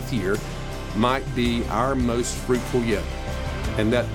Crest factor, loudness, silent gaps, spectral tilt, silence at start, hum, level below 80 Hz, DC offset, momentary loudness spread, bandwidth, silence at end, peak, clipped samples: 18 dB; -24 LUFS; none; -5.5 dB/octave; 0 s; none; -32 dBFS; under 0.1%; 8 LU; 17.5 kHz; 0 s; -6 dBFS; under 0.1%